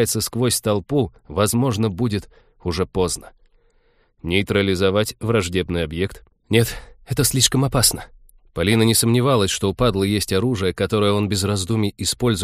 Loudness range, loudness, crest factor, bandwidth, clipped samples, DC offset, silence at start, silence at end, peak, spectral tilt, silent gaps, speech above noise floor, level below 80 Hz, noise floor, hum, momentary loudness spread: 5 LU; -20 LUFS; 20 dB; 15.5 kHz; under 0.1%; under 0.1%; 0 s; 0 s; 0 dBFS; -4.5 dB/octave; none; 40 dB; -40 dBFS; -60 dBFS; none; 9 LU